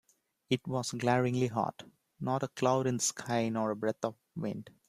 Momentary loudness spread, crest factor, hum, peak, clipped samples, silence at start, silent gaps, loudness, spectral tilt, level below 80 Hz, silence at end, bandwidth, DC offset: 10 LU; 20 dB; none; -12 dBFS; under 0.1%; 0.5 s; none; -33 LUFS; -5 dB/octave; -70 dBFS; 0.2 s; 15 kHz; under 0.1%